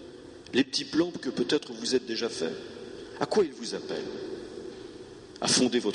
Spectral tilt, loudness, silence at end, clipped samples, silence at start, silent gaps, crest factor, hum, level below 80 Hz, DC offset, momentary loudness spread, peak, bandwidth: -3 dB/octave; -29 LUFS; 0 s; under 0.1%; 0 s; none; 20 dB; none; -64 dBFS; under 0.1%; 18 LU; -10 dBFS; 11.5 kHz